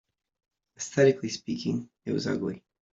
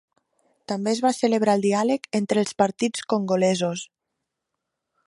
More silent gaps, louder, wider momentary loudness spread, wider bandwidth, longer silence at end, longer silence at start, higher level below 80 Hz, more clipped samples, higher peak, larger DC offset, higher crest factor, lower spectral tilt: neither; second, -28 LUFS vs -23 LUFS; first, 13 LU vs 8 LU; second, 8 kHz vs 11.5 kHz; second, 0.4 s vs 1.2 s; about the same, 0.8 s vs 0.7 s; about the same, -70 dBFS vs -70 dBFS; neither; second, -8 dBFS vs -4 dBFS; neither; about the same, 22 dB vs 20 dB; about the same, -5.5 dB/octave vs -5 dB/octave